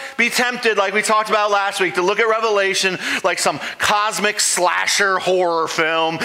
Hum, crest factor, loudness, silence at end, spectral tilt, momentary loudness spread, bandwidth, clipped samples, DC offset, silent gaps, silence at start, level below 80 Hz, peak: none; 16 dB; -17 LUFS; 0 s; -1.5 dB/octave; 3 LU; 16.5 kHz; under 0.1%; under 0.1%; none; 0 s; -62 dBFS; -2 dBFS